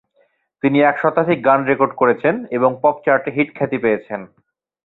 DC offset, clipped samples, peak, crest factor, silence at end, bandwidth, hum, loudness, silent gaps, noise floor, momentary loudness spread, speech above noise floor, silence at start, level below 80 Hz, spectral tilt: under 0.1%; under 0.1%; -2 dBFS; 16 dB; 0.6 s; 4.1 kHz; none; -17 LUFS; none; -61 dBFS; 6 LU; 45 dB; 0.65 s; -60 dBFS; -9.5 dB/octave